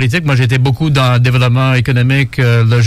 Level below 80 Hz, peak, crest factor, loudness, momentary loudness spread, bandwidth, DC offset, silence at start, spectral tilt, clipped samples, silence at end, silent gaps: -36 dBFS; 0 dBFS; 10 dB; -11 LUFS; 2 LU; 13 kHz; under 0.1%; 0 s; -6.5 dB/octave; under 0.1%; 0 s; none